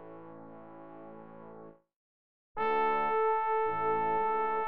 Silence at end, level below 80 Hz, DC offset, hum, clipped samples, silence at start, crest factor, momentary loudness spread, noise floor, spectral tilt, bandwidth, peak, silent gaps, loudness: 0 s; -70 dBFS; under 0.1%; none; under 0.1%; 0 s; 14 dB; 21 LU; -52 dBFS; -3 dB/octave; 5.2 kHz; -20 dBFS; 1.96-2.55 s; -30 LUFS